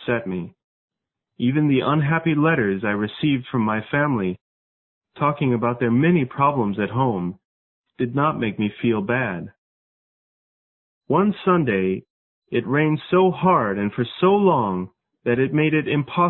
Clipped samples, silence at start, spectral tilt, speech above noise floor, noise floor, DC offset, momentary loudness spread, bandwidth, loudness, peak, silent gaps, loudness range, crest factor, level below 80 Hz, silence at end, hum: under 0.1%; 0 s; -12 dB/octave; over 70 dB; under -90 dBFS; under 0.1%; 10 LU; 4.2 kHz; -21 LUFS; -4 dBFS; 0.64-0.88 s, 4.41-5.01 s, 7.45-7.82 s, 9.58-11.01 s, 12.10-12.42 s; 5 LU; 18 dB; -56 dBFS; 0 s; none